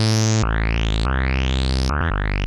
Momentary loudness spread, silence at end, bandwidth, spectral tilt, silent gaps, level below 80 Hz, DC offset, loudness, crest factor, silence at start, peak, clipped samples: 3 LU; 0 s; 12 kHz; -5 dB/octave; none; -22 dBFS; under 0.1%; -21 LUFS; 12 dB; 0 s; -8 dBFS; under 0.1%